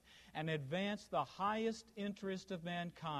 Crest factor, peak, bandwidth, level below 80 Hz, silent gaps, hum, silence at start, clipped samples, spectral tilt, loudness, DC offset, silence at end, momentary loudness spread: 16 dB; -26 dBFS; 13 kHz; -74 dBFS; none; none; 0.05 s; under 0.1%; -5.5 dB/octave; -42 LUFS; under 0.1%; 0 s; 7 LU